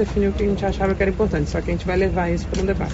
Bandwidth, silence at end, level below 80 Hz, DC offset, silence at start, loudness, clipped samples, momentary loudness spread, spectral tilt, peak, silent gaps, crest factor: 8 kHz; 0 s; -28 dBFS; under 0.1%; 0 s; -21 LUFS; under 0.1%; 3 LU; -6.5 dB/octave; -6 dBFS; none; 14 dB